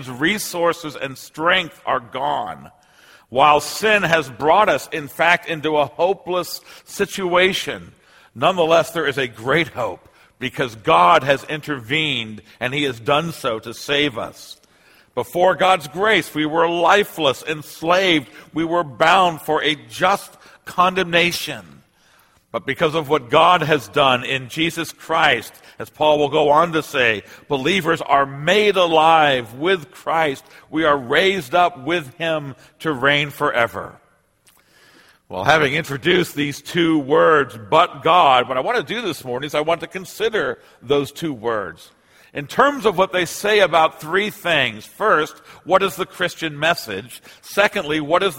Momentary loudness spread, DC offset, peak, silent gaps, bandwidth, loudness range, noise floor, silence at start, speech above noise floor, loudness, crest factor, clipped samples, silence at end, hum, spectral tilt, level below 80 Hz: 13 LU; under 0.1%; 0 dBFS; none; 16.5 kHz; 4 LU; -57 dBFS; 0 s; 39 dB; -18 LUFS; 20 dB; under 0.1%; 0 s; none; -4 dB/octave; -56 dBFS